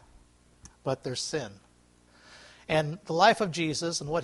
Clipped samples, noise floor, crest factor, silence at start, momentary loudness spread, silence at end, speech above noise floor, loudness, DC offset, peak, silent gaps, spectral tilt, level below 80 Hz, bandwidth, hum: under 0.1%; -61 dBFS; 24 dB; 0.65 s; 14 LU; 0 s; 33 dB; -28 LUFS; under 0.1%; -6 dBFS; none; -4 dB/octave; -60 dBFS; 11.5 kHz; 60 Hz at -60 dBFS